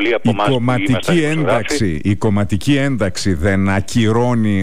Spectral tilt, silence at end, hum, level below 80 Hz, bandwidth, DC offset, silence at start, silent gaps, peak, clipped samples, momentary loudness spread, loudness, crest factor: -6 dB/octave; 0 s; none; -38 dBFS; 15.5 kHz; 6%; 0 s; none; -6 dBFS; under 0.1%; 3 LU; -16 LUFS; 10 dB